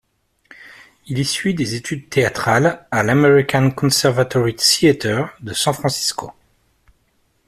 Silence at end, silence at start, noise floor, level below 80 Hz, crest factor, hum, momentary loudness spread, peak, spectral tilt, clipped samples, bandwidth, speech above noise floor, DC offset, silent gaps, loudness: 1.15 s; 0.6 s; -63 dBFS; -52 dBFS; 18 dB; none; 10 LU; 0 dBFS; -4.5 dB/octave; under 0.1%; 15 kHz; 46 dB; under 0.1%; none; -17 LUFS